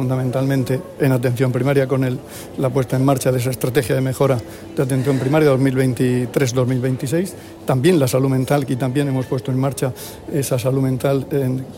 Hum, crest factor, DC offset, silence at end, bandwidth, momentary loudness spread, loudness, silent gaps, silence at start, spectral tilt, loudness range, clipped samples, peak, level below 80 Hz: none; 14 dB; under 0.1%; 0 s; 16.5 kHz; 8 LU; -19 LUFS; none; 0 s; -6.5 dB/octave; 2 LU; under 0.1%; -4 dBFS; -50 dBFS